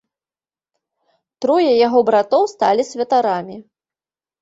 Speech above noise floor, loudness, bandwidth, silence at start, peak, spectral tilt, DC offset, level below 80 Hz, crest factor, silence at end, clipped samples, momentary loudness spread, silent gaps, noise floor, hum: over 74 dB; -16 LUFS; 8 kHz; 1.4 s; -2 dBFS; -5 dB/octave; under 0.1%; -66 dBFS; 16 dB; 0.8 s; under 0.1%; 9 LU; none; under -90 dBFS; none